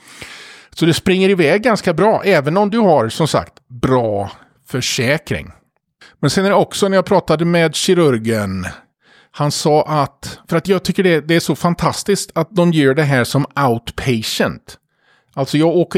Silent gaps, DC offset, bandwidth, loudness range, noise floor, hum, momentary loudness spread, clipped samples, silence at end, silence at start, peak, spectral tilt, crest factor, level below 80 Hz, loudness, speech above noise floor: none; under 0.1%; 16.5 kHz; 3 LU; -58 dBFS; none; 12 LU; under 0.1%; 0 s; 0.15 s; -2 dBFS; -5.5 dB/octave; 14 dB; -46 dBFS; -15 LUFS; 43 dB